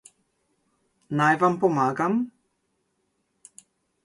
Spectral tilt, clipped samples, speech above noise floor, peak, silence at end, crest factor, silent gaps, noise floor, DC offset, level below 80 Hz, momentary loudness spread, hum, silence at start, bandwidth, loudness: -6.5 dB/octave; under 0.1%; 52 dB; -8 dBFS; 1.75 s; 18 dB; none; -74 dBFS; under 0.1%; -72 dBFS; 10 LU; none; 1.1 s; 11.5 kHz; -23 LUFS